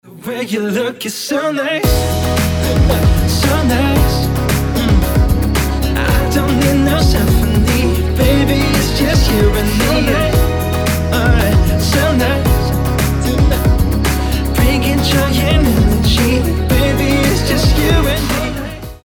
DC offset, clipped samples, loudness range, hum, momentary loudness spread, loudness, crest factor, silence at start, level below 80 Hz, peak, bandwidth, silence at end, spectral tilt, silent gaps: under 0.1%; under 0.1%; 1 LU; none; 4 LU; -14 LUFS; 12 dB; 0.05 s; -18 dBFS; -2 dBFS; 20 kHz; 0.1 s; -5.5 dB/octave; none